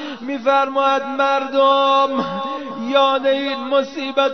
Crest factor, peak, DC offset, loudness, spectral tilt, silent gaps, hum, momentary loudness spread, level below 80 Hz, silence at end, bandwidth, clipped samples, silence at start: 16 dB; -2 dBFS; 0.3%; -18 LUFS; -4 dB/octave; none; none; 9 LU; -66 dBFS; 0 s; 6.4 kHz; under 0.1%; 0 s